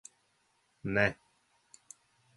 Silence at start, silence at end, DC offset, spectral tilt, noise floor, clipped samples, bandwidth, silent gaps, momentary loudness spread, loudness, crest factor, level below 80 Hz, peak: 0.85 s; 1.25 s; under 0.1%; -5.5 dB/octave; -74 dBFS; under 0.1%; 11.5 kHz; none; 25 LU; -32 LUFS; 26 dB; -62 dBFS; -12 dBFS